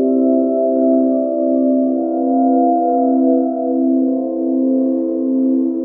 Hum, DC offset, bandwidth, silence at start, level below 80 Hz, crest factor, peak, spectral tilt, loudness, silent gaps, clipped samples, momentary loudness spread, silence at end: none; under 0.1%; 1.5 kHz; 0 s; -72 dBFS; 12 dB; -4 dBFS; -14 dB/octave; -15 LUFS; none; under 0.1%; 4 LU; 0 s